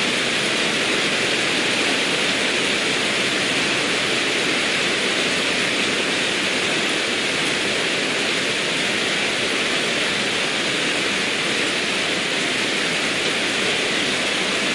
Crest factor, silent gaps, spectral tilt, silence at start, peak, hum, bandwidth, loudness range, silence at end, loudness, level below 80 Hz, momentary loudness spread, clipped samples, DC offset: 14 dB; none; -1.5 dB/octave; 0 s; -8 dBFS; none; 11.5 kHz; 1 LU; 0 s; -19 LUFS; -58 dBFS; 1 LU; under 0.1%; under 0.1%